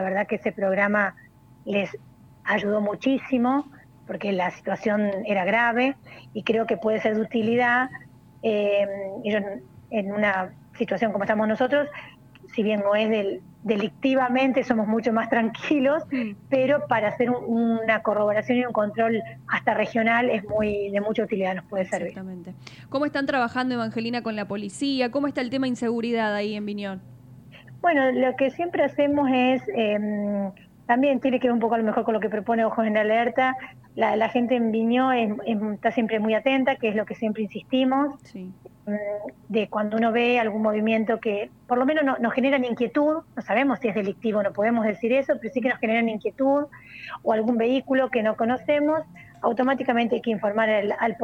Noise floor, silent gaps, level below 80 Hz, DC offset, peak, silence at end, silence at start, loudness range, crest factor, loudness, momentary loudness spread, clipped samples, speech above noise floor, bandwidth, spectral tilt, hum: -47 dBFS; none; -62 dBFS; under 0.1%; -6 dBFS; 0 s; 0 s; 3 LU; 18 dB; -24 LUFS; 9 LU; under 0.1%; 23 dB; 10 kHz; -6.5 dB/octave; none